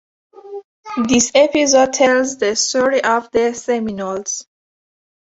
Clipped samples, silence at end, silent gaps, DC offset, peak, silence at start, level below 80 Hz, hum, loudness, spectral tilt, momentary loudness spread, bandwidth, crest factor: under 0.1%; 0.85 s; 0.64-0.83 s; under 0.1%; 0 dBFS; 0.35 s; -54 dBFS; none; -16 LUFS; -2.5 dB/octave; 15 LU; 8 kHz; 16 dB